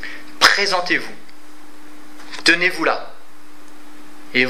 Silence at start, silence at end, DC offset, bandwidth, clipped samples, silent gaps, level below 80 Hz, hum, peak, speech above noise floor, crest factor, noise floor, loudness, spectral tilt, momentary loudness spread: 0 s; 0 s; 5%; 16 kHz; under 0.1%; none; -66 dBFS; none; 0 dBFS; 27 dB; 22 dB; -46 dBFS; -16 LUFS; -1.5 dB/octave; 19 LU